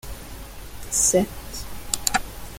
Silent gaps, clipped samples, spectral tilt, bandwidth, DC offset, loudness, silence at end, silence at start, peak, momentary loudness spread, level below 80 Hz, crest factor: none; under 0.1%; -2.5 dB/octave; 17 kHz; under 0.1%; -22 LUFS; 0 s; 0.05 s; 0 dBFS; 21 LU; -40 dBFS; 26 dB